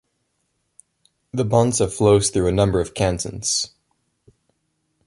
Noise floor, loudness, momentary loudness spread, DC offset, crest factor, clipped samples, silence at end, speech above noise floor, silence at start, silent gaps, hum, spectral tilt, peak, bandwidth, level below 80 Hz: -71 dBFS; -20 LUFS; 9 LU; under 0.1%; 20 dB; under 0.1%; 1.4 s; 53 dB; 1.35 s; none; none; -5 dB/octave; -2 dBFS; 11.5 kHz; -40 dBFS